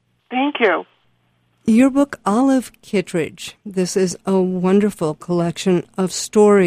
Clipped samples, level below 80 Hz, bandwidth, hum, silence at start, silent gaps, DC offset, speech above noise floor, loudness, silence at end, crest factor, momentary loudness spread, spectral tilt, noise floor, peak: under 0.1%; -56 dBFS; 15.5 kHz; none; 0.3 s; none; under 0.1%; 45 dB; -18 LUFS; 0 s; 14 dB; 9 LU; -5.5 dB/octave; -62 dBFS; -2 dBFS